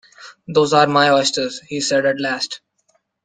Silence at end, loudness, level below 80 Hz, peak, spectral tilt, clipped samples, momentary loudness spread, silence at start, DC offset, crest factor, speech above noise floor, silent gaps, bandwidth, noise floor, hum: 0.7 s; -17 LUFS; -62 dBFS; -2 dBFS; -3.5 dB/octave; under 0.1%; 11 LU; 0.2 s; under 0.1%; 18 dB; 47 dB; none; 9.8 kHz; -64 dBFS; none